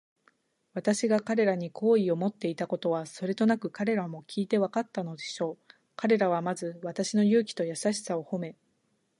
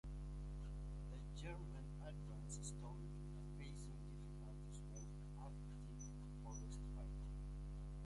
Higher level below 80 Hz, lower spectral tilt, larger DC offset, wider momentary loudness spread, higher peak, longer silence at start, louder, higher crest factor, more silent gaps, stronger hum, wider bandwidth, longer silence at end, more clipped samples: second, -80 dBFS vs -52 dBFS; about the same, -5.5 dB/octave vs -6 dB/octave; neither; first, 10 LU vs 3 LU; first, -12 dBFS vs -38 dBFS; first, 0.75 s vs 0.05 s; first, -29 LUFS vs -53 LUFS; first, 18 dB vs 12 dB; neither; second, none vs 50 Hz at -50 dBFS; about the same, 11.5 kHz vs 11.5 kHz; first, 0.65 s vs 0 s; neither